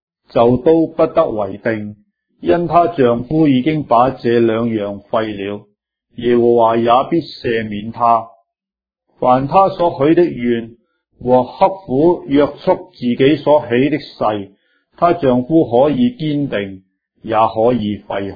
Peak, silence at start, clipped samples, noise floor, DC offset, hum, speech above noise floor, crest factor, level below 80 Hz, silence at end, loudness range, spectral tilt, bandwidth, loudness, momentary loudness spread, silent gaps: 0 dBFS; 0.35 s; under 0.1%; -89 dBFS; under 0.1%; none; 74 dB; 14 dB; -46 dBFS; 0 s; 2 LU; -10 dB/octave; 5 kHz; -15 LUFS; 9 LU; none